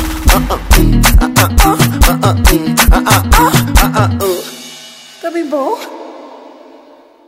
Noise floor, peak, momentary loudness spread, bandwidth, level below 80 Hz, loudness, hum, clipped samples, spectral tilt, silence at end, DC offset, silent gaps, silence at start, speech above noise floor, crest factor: -41 dBFS; 0 dBFS; 18 LU; 16.5 kHz; -14 dBFS; -11 LUFS; none; 0.3%; -4.5 dB/octave; 0.8 s; under 0.1%; none; 0 s; 32 dB; 10 dB